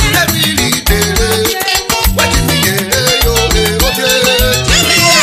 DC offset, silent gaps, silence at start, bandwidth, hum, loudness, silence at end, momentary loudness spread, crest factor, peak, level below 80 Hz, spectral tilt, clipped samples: under 0.1%; none; 0 s; 16.5 kHz; none; -10 LUFS; 0 s; 3 LU; 10 dB; 0 dBFS; -20 dBFS; -2.5 dB/octave; 0.1%